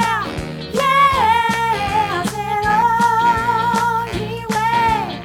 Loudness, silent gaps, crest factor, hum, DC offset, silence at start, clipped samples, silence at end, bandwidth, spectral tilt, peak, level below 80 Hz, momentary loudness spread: -17 LUFS; none; 14 dB; none; under 0.1%; 0 s; under 0.1%; 0 s; 17.5 kHz; -4.5 dB/octave; -4 dBFS; -40 dBFS; 9 LU